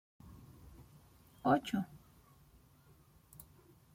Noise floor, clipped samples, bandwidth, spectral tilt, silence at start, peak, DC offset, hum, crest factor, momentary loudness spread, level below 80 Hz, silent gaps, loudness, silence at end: -65 dBFS; under 0.1%; 16.5 kHz; -6.5 dB/octave; 0.25 s; -18 dBFS; under 0.1%; none; 24 dB; 27 LU; -66 dBFS; none; -36 LUFS; 2 s